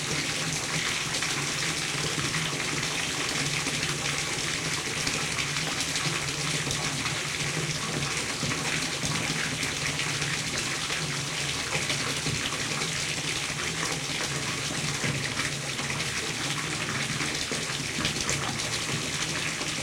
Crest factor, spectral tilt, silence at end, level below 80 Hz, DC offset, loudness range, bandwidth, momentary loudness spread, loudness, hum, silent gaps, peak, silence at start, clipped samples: 20 dB; -2 dB/octave; 0 s; -52 dBFS; under 0.1%; 1 LU; 16.5 kHz; 2 LU; -28 LUFS; none; none; -10 dBFS; 0 s; under 0.1%